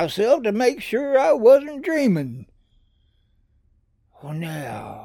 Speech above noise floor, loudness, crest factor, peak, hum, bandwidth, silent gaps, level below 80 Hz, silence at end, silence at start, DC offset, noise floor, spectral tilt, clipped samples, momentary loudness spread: 43 dB; -20 LUFS; 18 dB; -4 dBFS; none; 17.5 kHz; none; -60 dBFS; 0 s; 0 s; under 0.1%; -62 dBFS; -6 dB/octave; under 0.1%; 18 LU